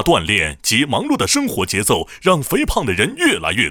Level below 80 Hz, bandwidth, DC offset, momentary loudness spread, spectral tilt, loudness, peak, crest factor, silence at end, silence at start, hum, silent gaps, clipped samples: -34 dBFS; over 20 kHz; under 0.1%; 3 LU; -3.5 dB/octave; -16 LUFS; -2 dBFS; 16 dB; 0 s; 0 s; none; none; under 0.1%